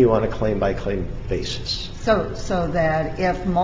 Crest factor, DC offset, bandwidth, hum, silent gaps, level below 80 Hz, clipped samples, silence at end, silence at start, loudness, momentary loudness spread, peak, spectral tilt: 16 dB; under 0.1%; 7.8 kHz; none; none; -34 dBFS; under 0.1%; 0 s; 0 s; -23 LUFS; 6 LU; -6 dBFS; -6 dB/octave